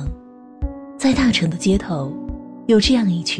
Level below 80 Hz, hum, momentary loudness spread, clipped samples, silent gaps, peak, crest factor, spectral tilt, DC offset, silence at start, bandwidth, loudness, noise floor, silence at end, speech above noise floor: -32 dBFS; none; 16 LU; under 0.1%; none; -4 dBFS; 14 dB; -5 dB/octave; under 0.1%; 0 s; 10.5 kHz; -18 LUFS; -39 dBFS; 0 s; 22 dB